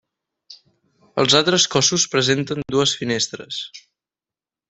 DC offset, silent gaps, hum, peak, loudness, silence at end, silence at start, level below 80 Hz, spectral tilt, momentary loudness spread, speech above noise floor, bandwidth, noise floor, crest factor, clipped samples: under 0.1%; none; none; -2 dBFS; -18 LUFS; 0.9 s; 0.5 s; -58 dBFS; -2.5 dB/octave; 14 LU; over 71 dB; 8.4 kHz; under -90 dBFS; 20 dB; under 0.1%